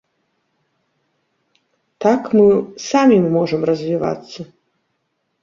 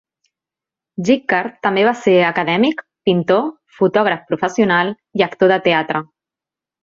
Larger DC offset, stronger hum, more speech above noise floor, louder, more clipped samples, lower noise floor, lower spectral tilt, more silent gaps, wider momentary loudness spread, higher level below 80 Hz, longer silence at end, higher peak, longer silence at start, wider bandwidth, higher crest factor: neither; neither; second, 55 dB vs 72 dB; about the same, -16 LUFS vs -16 LUFS; neither; second, -71 dBFS vs -88 dBFS; about the same, -6.5 dB/octave vs -6 dB/octave; neither; first, 18 LU vs 8 LU; about the same, -60 dBFS vs -60 dBFS; first, 0.95 s vs 0.8 s; about the same, -2 dBFS vs -2 dBFS; first, 2 s vs 1 s; about the same, 7.4 kHz vs 7.6 kHz; about the same, 16 dB vs 16 dB